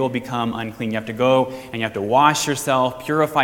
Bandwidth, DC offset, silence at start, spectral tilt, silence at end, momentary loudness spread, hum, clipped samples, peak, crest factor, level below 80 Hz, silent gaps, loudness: 18.5 kHz; under 0.1%; 0 s; -4.5 dB/octave; 0 s; 10 LU; none; under 0.1%; 0 dBFS; 20 dB; -56 dBFS; none; -20 LUFS